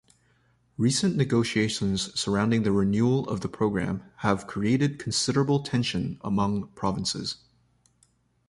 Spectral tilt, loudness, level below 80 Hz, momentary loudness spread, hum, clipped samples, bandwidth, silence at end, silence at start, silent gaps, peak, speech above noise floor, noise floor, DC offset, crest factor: -5 dB/octave; -26 LUFS; -52 dBFS; 7 LU; none; under 0.1%; 11.5 kHz; 1.15 s; 0.8 s; none; -8 dBFS; 41 dB; -66 dBFS; under 0.1%; 20 dB